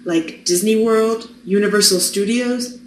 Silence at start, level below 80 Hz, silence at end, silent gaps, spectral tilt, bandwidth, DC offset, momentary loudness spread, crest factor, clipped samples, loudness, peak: 0 s; -62 dBFS; 0 s; none; -3 dB/octave; 14.5 kHz; under 0.1%; 8 LU; 18 dB; under 0.1%; -16 LUFS; 0 dBFS